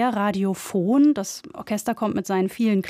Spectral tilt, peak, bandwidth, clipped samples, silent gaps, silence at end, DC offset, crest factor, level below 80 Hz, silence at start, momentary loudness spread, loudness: -6 dB/octave; -10 dBFS; 16 kHz; under 0.1%; none; 0 s; under 0.1%; 12 dB; -64 dBFS; 0 s; 10 LU; -23 LUFS